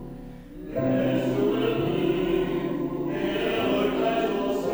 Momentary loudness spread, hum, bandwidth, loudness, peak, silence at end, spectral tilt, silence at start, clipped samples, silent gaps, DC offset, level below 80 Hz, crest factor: 8 LU; none; over 20 kHz; -25 LUFS; -12 dBFS; 0 s; -7 dB/octave; 0 s; under 0.1%; none; under 0.1%; -48 dBFS; 14 dB